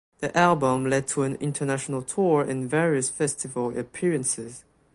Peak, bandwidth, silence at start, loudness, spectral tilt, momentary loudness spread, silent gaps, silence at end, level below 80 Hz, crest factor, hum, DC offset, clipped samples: -6 dBFS; 11.5 kHz; 0.2 s; -25 LUFS; -5 dB/octave; 8 LU; none; 0.35 s; -60 dBFS; 20 dB; none; under 0.1%; under 0.1%